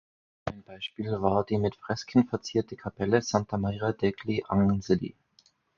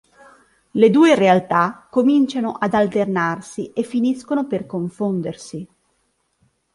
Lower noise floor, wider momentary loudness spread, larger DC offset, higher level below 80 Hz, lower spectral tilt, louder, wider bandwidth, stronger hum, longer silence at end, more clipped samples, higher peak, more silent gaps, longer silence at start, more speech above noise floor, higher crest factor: about the same, -65 dBFS vs -67 dBFS; about the same, 13 LU vs 15 LU; neither; first, -52 dBFS vs -60 dBFS; about the same, -6.5 dB/octave vs -6.5 dB/octave; second, -29 LUFS vs -18 LUFS; second, 7.4 kHz vs 11.5 kHz; neither; second, 0.65 s vs 1.1 s; neither; second, -8 dBFS vs -2 dBFS; neither; second, 0.45 s vs 0.75 s; second, 38 dB vs 50 dB; about the same, 22 dB vs 18 dB